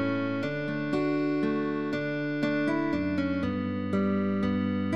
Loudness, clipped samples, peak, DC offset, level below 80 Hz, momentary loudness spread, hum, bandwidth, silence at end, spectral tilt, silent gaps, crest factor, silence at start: -29 LUFS; under 0.1%; -16 dBFS; 0.3%; -60 dBFS; 3 LU; none; 7.8 kHz; 0 s; -8 dB/octave; none; 12 dB; 0 s